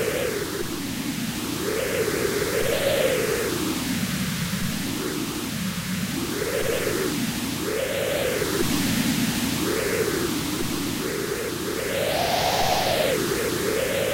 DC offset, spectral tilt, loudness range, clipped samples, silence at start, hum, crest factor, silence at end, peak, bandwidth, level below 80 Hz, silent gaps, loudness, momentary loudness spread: under 0.1%; -3.5 dB/octave; 2 LU; under 0.1%; 0 s; none; 16 dB; 0 s; -10 dBFS; 16 kHz; -44 dBFS; none; -25 LUFS; 6 LU